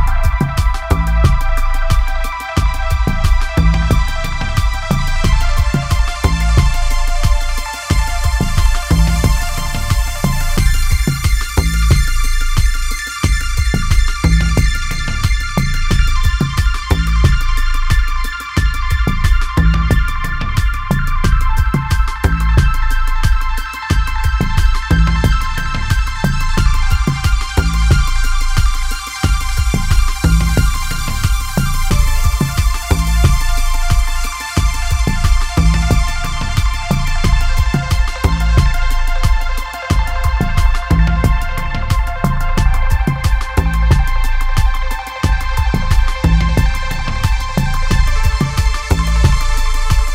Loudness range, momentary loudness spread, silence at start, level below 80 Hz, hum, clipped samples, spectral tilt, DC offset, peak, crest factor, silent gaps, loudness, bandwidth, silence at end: 1 LU; 5 LU; 0 s; -14 dBFS; none; under 0.1%; -5 dB/octave; under 0.1%; 0 dBFS; 12 dB; none; -16 LUFS; 16 kHz; 0 s